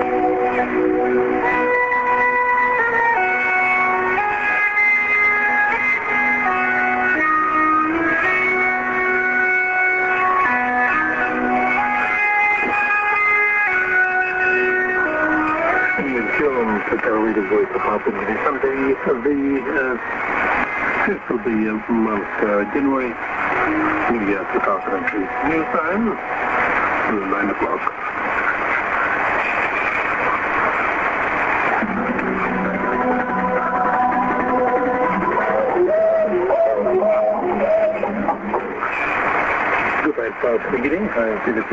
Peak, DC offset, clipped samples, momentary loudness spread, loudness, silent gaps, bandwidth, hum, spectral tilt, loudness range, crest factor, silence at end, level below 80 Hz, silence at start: -2 dBFS; under 0.1%; under 0.1%; 5 LU; -18 LUFS; none; 7.8 kHz; none; -6.5 dB/octave; 4 LU; 16 dB; 0 s; -48 dBFS; 0 s